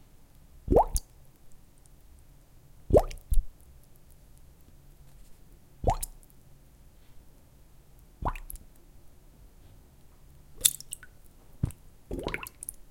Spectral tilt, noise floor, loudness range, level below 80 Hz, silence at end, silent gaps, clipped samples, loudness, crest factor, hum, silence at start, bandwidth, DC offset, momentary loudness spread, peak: -4 dB/octave; -55 dBFS; 14 LU; -38 dBFS; 0.1 s; none; under 0.1%; -30 LUFS; 34 dB; none; 0.55 s; 17 kHz; under 0.1%; 19 LU; 0 dBFS